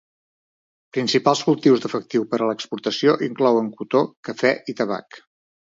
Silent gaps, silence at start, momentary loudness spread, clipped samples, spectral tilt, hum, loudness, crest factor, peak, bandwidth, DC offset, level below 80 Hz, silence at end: 4.17-4.23 s; 0.95 s; 8 LU; under 0.1%; -5 dB/octave; none; -21 LUFS; 20 dB; -2 dBFS; 7.8 kHz; under 0.1%; -72 dBFS; 0.6 s